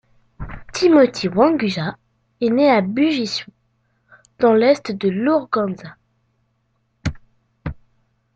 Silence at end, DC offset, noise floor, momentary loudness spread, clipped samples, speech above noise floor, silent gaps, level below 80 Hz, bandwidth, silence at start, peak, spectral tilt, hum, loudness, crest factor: 0.6 s; under 0.1%; -67 dBFS; 19 LU; under 0.1%; 50 dB; none; -44 dBFS; 8.8 kHz; 0.4 s; -2 dBFS; -6 dB/octave; none; -18 LUFS; 18 dB